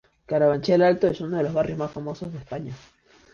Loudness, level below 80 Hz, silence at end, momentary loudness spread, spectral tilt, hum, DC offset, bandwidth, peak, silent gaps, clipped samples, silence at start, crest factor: -23 LUFS; -54 dBFS; 0.55 s; 16 LU; -7.5 dB/octave; none; under 0.1%; 7.2 kHz; -8 dBFS; none; under 0.1%; 0.3 s; 16 dB